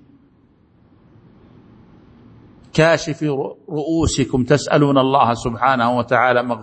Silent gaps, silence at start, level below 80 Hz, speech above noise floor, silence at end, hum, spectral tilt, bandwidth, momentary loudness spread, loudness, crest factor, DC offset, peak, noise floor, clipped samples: none; 2.75 s; -42 dBFS; 37 dB; 0 s; none; -5.5 dB/octave; 8.8 kHz; 8 LU; -17 LUFS; 18 dB; under 0.1%; 0 dBFS; -54 dBFS; under 0.1%